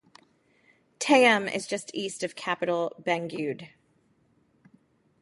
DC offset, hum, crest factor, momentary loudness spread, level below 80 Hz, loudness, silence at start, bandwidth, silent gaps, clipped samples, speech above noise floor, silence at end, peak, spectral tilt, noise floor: under 0.1%; none; 24 dB; 14 LU; -76 dBFS; -26 LUFS; 1 s; 11.5 kHz; none; under 0.1%; 41 dB; 1.55 s; -6 dBFS; -3.5 dB/octave; -67 dBFS